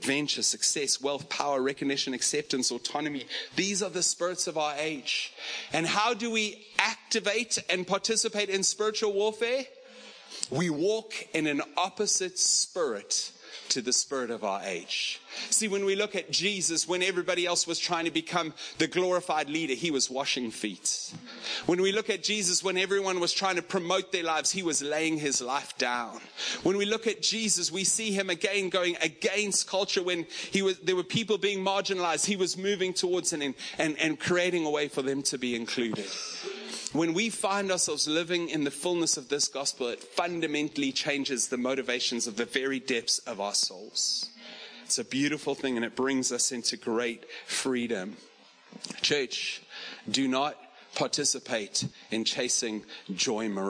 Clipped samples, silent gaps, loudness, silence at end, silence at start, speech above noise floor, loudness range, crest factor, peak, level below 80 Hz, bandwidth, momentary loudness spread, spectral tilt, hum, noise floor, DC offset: under 0.1%; none; -28 LUFS; 0 s; 0 s; 20 dB; 3 LU; 26 dB; -4 dBFS; -74 dBFS; 10.5 kHz; 7 LU; -2 dB/octave; none; -50 dBFS; under 0.1%